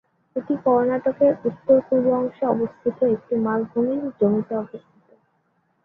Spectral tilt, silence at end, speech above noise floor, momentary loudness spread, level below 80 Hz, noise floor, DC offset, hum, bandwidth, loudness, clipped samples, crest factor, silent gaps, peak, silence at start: -11 dB/octave; 1.05 s; 46 dB; 10 LU; -64 dBFS; -67 dBFS; under 0.1%; none; 3.6 kHz; -22 LUFS; under 0.1%; 16 dB; none; -6 dBFS; 0.35 s